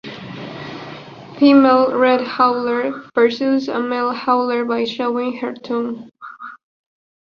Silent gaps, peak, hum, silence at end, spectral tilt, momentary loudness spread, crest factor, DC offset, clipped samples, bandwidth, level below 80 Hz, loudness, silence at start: none; -2 dBFS; none; 0.85 s; -6.5 dB/octave; 21 LU; 16 dB; under 0.1%; under 0.1%; 6.8 kHz; -64 dBFS; -17 LUFS; 0.05 s